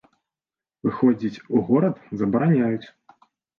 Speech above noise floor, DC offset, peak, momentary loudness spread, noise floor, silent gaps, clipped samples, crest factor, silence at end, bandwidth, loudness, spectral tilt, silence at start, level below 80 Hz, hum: over 69 dB; under 0.1%; -6 dBFS; 8 LU; under -90 dBFS; none; under 0.1%; 16 dB; 0.7 s; 6.4 kHz; -22 LUFS; -10 dB/octave; 0.85 s; -62 dBFS; none